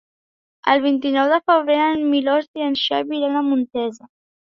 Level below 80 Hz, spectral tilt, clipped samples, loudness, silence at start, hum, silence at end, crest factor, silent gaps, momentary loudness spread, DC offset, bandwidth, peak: -64 dBFS; -4.5 dB/octave; under 0.1%; -19 LUFS; 0.65 s; none; 0.45 s; 18 dB; 2.48-2.54 s; 7 LU; under 0.1%; 7.2 kHz; -2 dBFS